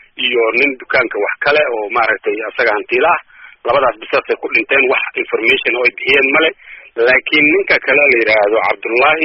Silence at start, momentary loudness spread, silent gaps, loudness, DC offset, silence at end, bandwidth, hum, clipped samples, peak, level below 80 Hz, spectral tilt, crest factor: 0.2 s; 7 LU; none; -13 LUFS; under 0.1%; 0 s; 6 kHz; none; under 0.1%; 0 dBFS; -52 dBFS; 0 dB/octave; 14 dB